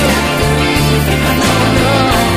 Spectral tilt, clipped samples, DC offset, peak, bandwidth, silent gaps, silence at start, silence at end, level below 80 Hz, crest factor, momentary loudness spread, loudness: -4.5 dB/octave; under 0.1%; under 0.1%; 0 dBFS; 15.5 kHz; none; 0 s; 0 s; -22 dBFS; 10 dB; 2 LU; -11 LUFS